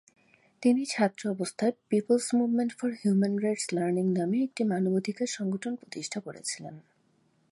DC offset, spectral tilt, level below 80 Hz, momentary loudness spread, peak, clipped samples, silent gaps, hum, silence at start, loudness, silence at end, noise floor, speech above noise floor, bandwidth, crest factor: under 0.1%; -5.5 dB/octave; -78 dBFS; 10 LU; -12 dBFS; under 0.1%; none; none; 0.6 s; -29 LUFS; 0.7 s; -68 dBFS; 40 dB; 11.5 kHz; 18 dB